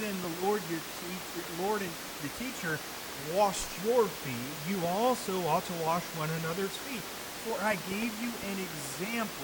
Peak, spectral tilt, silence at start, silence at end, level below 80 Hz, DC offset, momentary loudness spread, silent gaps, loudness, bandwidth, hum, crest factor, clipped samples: -14 dBFS; -4 dB/octave; 0 s; 0 s; -60 dBFS; under 0.1%; 9 LU; none; -33 LUFS; 19 kHz; none; 18 dB; under 0.1%